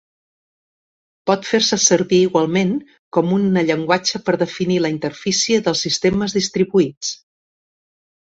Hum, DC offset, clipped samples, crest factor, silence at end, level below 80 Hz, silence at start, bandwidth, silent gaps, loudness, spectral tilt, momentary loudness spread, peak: none; under 0.1%; under 0.1%; 18 dB; 1.15 s; -54 dBFS; 1.25 s; 8 kHz; 2.99-3.11 s, 6.97-7.01 s; -18 LUFS; -4 dB/octave; 8 LU; 0 dBFS